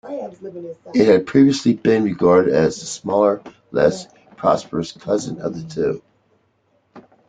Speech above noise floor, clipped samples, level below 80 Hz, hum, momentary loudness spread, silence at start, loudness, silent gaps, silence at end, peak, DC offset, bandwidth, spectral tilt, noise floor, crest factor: 46 dB; under 0.1%; -54 dBFS; none; 17 LU; 0.05 s; -18 LUFS; none; 0.3 s; -2 dBFS; under 0.1%; 9.4 kHz; -6 dB/octave; -63 dBFS; 18 dB